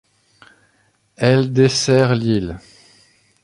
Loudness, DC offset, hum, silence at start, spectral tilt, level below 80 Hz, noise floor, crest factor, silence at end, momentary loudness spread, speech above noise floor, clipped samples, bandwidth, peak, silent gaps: -16 LUFS; under 0.1%; none; 1.2 s; -5.5 dB/octave; -48 dBFS; -61 dBFS; 18 dB; 0.85 s; 11 LU; 45 dB; under 0.1%; 11.5 kHz; -2 dBFS; none